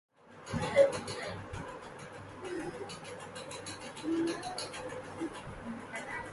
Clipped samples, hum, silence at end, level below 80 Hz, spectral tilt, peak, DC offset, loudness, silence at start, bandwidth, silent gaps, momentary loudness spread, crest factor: under 0.1%; none; 0 s; -60 dBFS; -4.5 dB/octave; -14 dBFS; under 0.1%; -37 LUFS; 0.25 s; 11.5 kHz; none; 16 LU; 24 dB